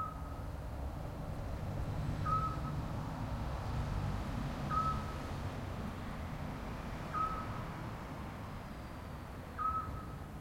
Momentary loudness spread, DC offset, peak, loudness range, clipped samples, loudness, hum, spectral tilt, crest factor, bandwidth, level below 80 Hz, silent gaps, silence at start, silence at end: 10 LU; under 0.1%; -22 dBFS; 4 LU; under 0.1%; -41 LUFS; none; -7 dB/octave; 18 dB; 16.5 kHz; -46 dBFS; none; 0 s; 0 s